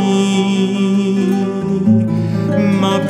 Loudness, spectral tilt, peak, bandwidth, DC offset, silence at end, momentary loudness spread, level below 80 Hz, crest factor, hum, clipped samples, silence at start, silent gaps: -15 LUFS; -6.5 dB/octave; -2 dBFS; 10.5 kHz; under 0.1%; 0 s; 3 LU; -52 dBFS; 12 dB; none; under 0.1%; 0 s; none